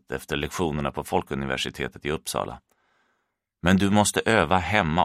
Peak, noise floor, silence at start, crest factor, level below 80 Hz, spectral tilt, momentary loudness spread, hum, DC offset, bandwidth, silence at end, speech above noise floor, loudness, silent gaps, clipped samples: -2 dBFS; -77 dBFS; 0.1 s; 22 dB; -46 dBFS; -4.5 dB/octave; 10 LU; none; under 0.1%; 15.5 kHz; 0 s; 53 dB; -24 LUFS; none; under 0.1%